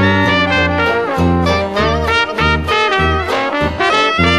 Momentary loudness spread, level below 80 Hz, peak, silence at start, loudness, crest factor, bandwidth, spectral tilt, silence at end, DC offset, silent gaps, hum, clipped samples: 3 LU; -28 dBFS; 0 dBFS; 0 s; -13 LUFS; 14 dB; 13.5 kHz; -5.5 dB/octave; 0 s; 0.2%; none; none; under 0.1%